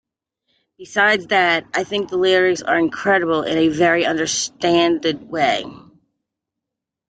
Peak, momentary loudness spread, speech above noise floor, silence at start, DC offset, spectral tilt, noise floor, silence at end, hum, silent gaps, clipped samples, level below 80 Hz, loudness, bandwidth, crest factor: -2 dBFS; 7 LU; 66 dB; 0.8 s; under 0.1%; -3.5 dB/octave; -83 dBFS; 1.35 s; none; none; under 0.1%; -58 dBFS; -17 LUFS; 9.4 kHz; 18 dB